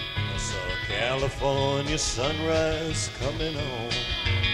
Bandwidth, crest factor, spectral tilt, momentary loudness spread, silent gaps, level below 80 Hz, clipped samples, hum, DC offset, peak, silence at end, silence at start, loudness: 13.5 kHz; 16 dB; -4 dB/octave; 5 LU; none; -38 dBFS; under 0.1%; none; under 0.1%; -12 dBFS; 0 s; 0 s; -27 LUFS